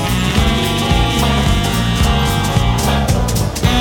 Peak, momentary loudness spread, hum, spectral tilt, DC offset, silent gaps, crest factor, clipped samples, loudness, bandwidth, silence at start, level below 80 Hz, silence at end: 0 dBFS; 2 LU; none; -5 dB/octave; under 0.1%; none; 14 dB; under 0.1%; -15 LUFS; 18.5 kHz; 0 s; -20 dBFS; 0 s